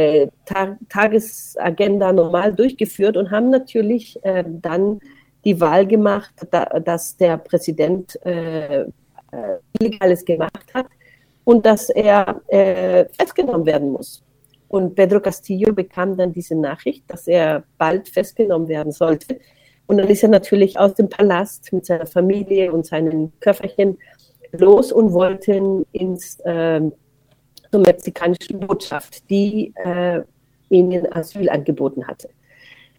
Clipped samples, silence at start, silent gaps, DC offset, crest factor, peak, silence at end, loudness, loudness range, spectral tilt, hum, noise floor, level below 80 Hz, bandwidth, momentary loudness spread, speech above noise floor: under 0.1%; 0 s; none; under 0.1%; 18 dB; 0 dBFS; 0.7 s; -17 LUFS; 4 LU; -6.5 dB/octave; none; -58 dBFS; -54 dBFS; 17.5 kHz; 11 LU; 41 dB